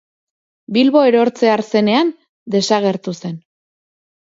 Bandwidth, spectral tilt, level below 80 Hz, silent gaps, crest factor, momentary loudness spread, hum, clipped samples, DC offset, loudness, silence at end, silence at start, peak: 7.8 kHz; -5.5 dB/octave; -68 dBFS; 2.29-2.46 s; 16 dB; 14 LU; none; under 0.1%; under 0.1%; -15 LUFS; 0.95 s; 0.7 s; 0 dBFS